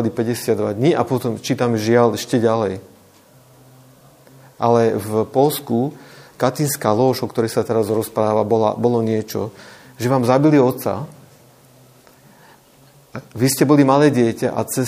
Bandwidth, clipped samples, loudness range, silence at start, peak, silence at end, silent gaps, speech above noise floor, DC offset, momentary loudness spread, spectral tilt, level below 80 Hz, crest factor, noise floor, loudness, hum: 15.5 kHz; under 0.1%; 3 LU; 0 s; 0 dBFS; 0 s; none; 32 dB; under 0.1%; 11 LU; -6 dB/octave; -62 dBFS; 18 dB; -50 dBFS; -18 LUFS; none